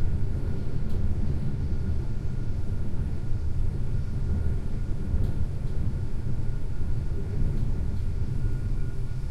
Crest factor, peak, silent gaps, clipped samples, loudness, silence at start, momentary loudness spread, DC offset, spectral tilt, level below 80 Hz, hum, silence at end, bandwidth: 12 dB; -12 dBFS; none; under 0.1%; -32 LUFS; 0 s; 3 LU; under 0.1%; -9 dB/octave; -28 dBFS; none; 0 s; 5.4 kHz